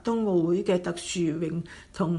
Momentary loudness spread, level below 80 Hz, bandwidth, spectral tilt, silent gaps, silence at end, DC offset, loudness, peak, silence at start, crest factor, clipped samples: 9 LU; -56 dBFS; 11.5 kHz; -6 dB/octave; none; 0 s; under 0.1%; -27 LUFS; -12 dBFS; 0.05 s; 14 dB; under 0.1%